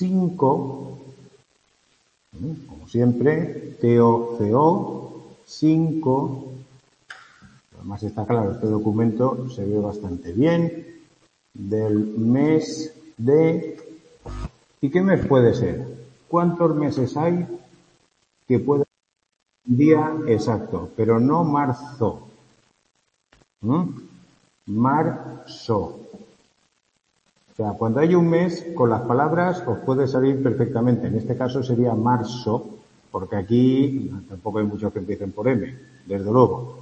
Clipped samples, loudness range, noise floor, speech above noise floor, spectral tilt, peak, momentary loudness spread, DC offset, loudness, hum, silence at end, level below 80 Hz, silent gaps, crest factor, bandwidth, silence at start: under 0.1%; 5 LU; -69 dBFS; 49 dB; -8.5 dB/octave; -2 dBFS; 18 LU; under 0.1%; -21 LUFS; none; 0 s; -52 dBFS; none; 20 dB; 8.6 kHz; 0 s